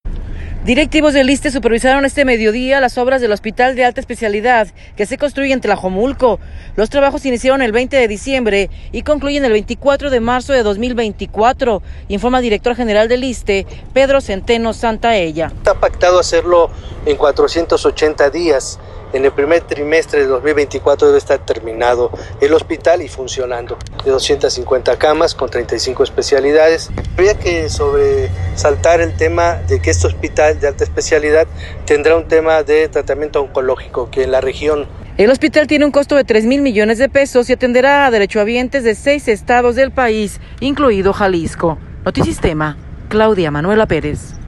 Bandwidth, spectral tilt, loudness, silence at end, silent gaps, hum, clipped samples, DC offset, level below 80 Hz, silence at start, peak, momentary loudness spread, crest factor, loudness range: 12 kHz; -5 dB/octave; -14 LUFS; 0 s; none; none; under 0.1%; under 0.1%; -30 dBFS; 0.05 s; 0 dBFS; 8 LU; 12 dB; 3 LU